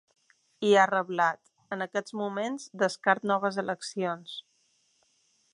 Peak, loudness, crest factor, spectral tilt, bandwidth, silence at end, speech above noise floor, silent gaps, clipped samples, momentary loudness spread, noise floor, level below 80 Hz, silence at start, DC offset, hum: -8 dBFS; -28 LUFS; 22 dB; -4.5 dB/octave; 11 kHz; 1.15 s; 42 dB; none; under 0.1%; 16 LU; -70 dBFS; -84 dBFS; 0.6 s; under 0.1%; none